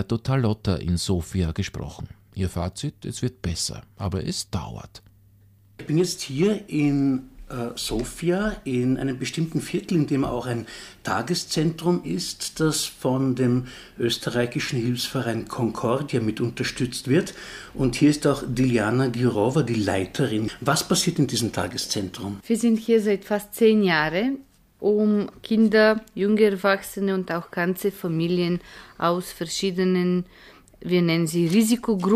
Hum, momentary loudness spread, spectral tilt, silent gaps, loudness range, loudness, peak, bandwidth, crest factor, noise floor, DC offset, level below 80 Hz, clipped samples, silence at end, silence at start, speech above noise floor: none; 10 LU; -5.5 dB/octave; none; 6 LU; -24 LUFS; -6 dBFS; 15.5 kHz; 18 dB; -55 dBFS; under 0.1%; -46 dBFS; under 0.1%; 0 s; 0 s; 31 dB